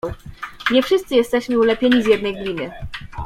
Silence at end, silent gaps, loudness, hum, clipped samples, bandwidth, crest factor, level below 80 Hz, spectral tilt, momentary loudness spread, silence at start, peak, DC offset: 0 s; none; -18 LUFS; none; under 0.1%; 15.5 kHz; 16 dB; -42 dBFS; -5 dB/octave; 17 LU; 0.05 s; -2 dBFS; under 0.1%